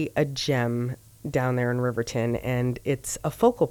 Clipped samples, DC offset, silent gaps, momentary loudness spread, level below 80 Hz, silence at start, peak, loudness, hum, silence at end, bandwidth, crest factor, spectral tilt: under 0.1%; under 0.1%; none; 7 LU; -50 dBFS; 0 s; -8 dBFS; -26 LUFS; none; 0 s; 19 kHz; 18 dB; -5.5 dB/octave